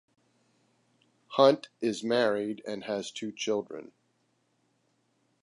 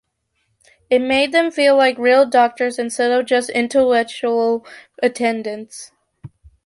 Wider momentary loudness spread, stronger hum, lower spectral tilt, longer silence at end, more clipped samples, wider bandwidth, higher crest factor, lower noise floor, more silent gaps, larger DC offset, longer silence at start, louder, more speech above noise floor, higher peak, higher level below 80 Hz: about the same, 14 LU vs 12 LU; neither; first, -4.5 dB/octave vs -3 dB/octave; first, 1.6 s vs 0.4 s; neither; about the same, 11.5 kHz vs 11.5 kHz; first, 24 dB vs 14 dB; first, -73 dBFS vs -69 dBFS; neither; neither; first, 1.3 s vs 0.9 s; second, -29 LUFS vs -16 LUFS; second, 45 dB vs 53 dB; second, -8 dBFS vs -2 dBFS; second, -80 dBFS vs -58 dBFS